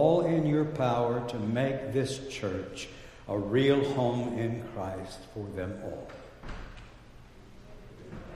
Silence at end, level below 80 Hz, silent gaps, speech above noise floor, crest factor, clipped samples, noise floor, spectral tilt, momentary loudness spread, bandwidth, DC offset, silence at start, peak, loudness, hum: 0 s; -52 dBFS; none; 21 dB; 20 dB; under 0.1%; -51 dBFS; -7 dB/octave; 21 LU; 13 kHz; under 0.1%; 0 s; -10 dBFS; -30 LUFS; none